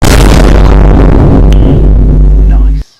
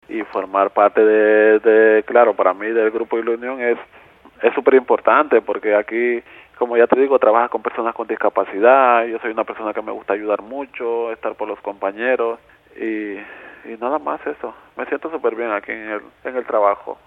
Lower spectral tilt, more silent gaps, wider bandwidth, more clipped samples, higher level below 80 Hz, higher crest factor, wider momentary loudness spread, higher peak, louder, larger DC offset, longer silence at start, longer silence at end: about the same, -6.5 dB/octave vs -7.5 dB/octave; neither; first, 13.5 kHz vs 4 kHz; first, 3% vs under 0.1%; first, -4 dBFS vs -64 dBFS; second, 2 dB vs 18 dB; second, 2 LU vs 14 LU; about the same, 0 dBFS vs 0 dBFS; first, -6 LUFS vs -18 LUFS; neither; about the same, 0 s vs 0.1 s; about the same, 0.15 s vs 0.1 s